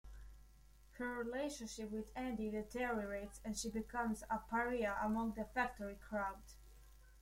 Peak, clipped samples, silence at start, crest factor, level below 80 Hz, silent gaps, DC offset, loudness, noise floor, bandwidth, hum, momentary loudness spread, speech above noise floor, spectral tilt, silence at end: -24 dBFS; under 0.1%; 0.05 s; 18 dB; -60 dBFS; none; under 0.1%; -42 LUFS; -64 dBFS; 16.5 kHz; none; 11 LU; 22 dB; -4.5 dB/octave; 0 s